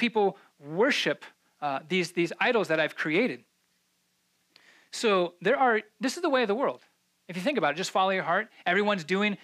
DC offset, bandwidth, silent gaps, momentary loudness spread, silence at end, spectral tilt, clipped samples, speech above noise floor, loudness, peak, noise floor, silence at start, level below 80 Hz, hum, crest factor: under 0.1%; 14.5 kHz; none; 10 LU; 0.1 s; -4.5 dB/octave; under 0.1%; 45 dB; -27 LUFS; -12 dBFS; -73 dBFS; 0 s; -84 dBFS; none; 16 dB